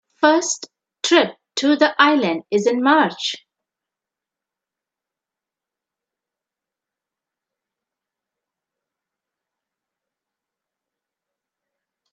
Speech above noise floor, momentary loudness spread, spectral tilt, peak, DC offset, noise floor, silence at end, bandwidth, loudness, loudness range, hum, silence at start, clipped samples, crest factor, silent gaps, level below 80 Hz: 70 dB; 11 LU; -3 dB/octave; 0 dBFS; under 0.1%; -87 dBFS; 8.75 s; 9 kHz; -18 LUFS; 8 LU; none; 0.2 s; under 0.1%; 24 dB; none; -76 dBFS